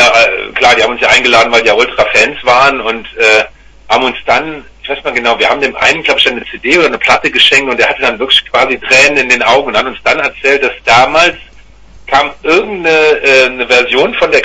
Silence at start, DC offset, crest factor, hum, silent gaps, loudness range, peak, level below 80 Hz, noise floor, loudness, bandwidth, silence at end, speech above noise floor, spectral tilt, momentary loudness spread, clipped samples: 0 s; under 0.1%; 10 dB; none; none; 3 LU; 0 dBFS; -40 dBFS; -35 dBFS; -8 LUFS; 11 kHz; 0 s; 26 dB; -2 dB/octave; 7 LU; 0.9%